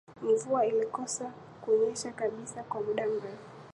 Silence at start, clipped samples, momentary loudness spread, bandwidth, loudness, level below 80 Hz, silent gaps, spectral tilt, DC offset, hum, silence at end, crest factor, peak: 0.1 s; under 0.1%; 14 LU; 11.5 kHz; -31 LUFS; -74 dBFS; none; -4 dB/octave; under 0.1%; none; 0 s; 16 dB; -16 dBFS